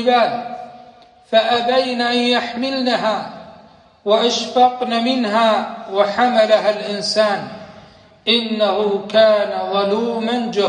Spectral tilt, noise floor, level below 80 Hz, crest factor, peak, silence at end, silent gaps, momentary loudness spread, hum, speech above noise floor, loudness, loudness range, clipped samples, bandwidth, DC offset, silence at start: -4 dB/octave; -46 dBFS; -64 dBFS; 16 dB; -2 dBFS; 0 s; none; 11 LU; none; 30 dB; -17 LUFS; 2 LU; under 0.1%; 9.8 kHz; under 0.1%; 0 s